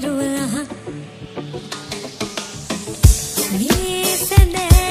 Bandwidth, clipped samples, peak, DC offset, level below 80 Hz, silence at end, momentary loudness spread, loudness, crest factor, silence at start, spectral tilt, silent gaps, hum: 15.5 kHz; under 0.1%; 0 dBFS; under 0.1%; -22 dBFS; 0 s; 16 LU; -18 LUFS; 18 dB; 0 s; -4.5 dB/octave; none; none